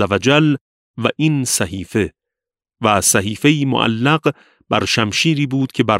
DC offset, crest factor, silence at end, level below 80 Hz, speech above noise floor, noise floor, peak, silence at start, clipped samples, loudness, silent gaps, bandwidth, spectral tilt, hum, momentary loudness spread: under 0.1%; 16 dB; 0 s; -50 dBFS; 71 dB; -87 dBFS; 0 dBFS; 0 s; under 0.1%; -16 LUFS; 0.61-0.94 s; 16 kHz; -4 dB/octave; none; 8 LU